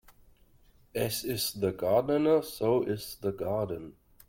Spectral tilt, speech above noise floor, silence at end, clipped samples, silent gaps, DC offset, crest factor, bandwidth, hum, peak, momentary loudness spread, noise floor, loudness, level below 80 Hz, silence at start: -5 dB/octave; 32 dB; 0.35 s; under 0.1%; none; under 0.1%; 16 dB; 16.5 kHz; none; -14 dBFS; 11 LU; -61 dBFS; -30 LUFS; -60 dBFS; 0.1 s